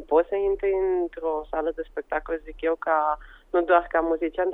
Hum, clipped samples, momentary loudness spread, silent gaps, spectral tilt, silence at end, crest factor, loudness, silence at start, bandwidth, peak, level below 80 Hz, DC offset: none; under 0.1%; 9 LU; none; -7.5 dB/octave; 0 s; 18 dB; -25 LUFS; 0 s; 3.9 kHz; -6 dBFS; -48 dBFS; under 0.1%